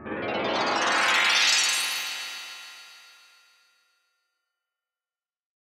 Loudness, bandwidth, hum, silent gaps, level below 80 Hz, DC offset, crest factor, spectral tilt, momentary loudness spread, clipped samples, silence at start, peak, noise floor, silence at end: -23 LUFS; 16 kHz; none; none; -70 dBFS; under 0.1%; 20 dB; 0 dB/octave; 21 LU; under 0.1%; 0 s; -8 dBFS; under -90 dBFS; 2.6 s